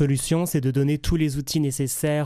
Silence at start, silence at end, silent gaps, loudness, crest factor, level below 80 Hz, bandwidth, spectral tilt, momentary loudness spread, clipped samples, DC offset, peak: 0 s; 0 s; none; -23 LUFS; 14 dB; -38 dBFS; 15.5 kHz; -5.5 dB/octave; 2 LU; under 0.1%; under 0.1%; -10 dBFS